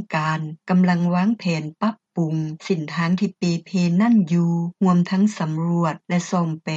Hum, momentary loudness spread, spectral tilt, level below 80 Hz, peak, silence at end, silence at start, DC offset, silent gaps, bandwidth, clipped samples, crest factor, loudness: none; 7 LU; -7 dB/octave; -66 dBFS; -8 dBFS; 0 s; 0 s; under 0.1%; none; 7.8 kHz; under 0.1%; 12 dB; -21 LUFS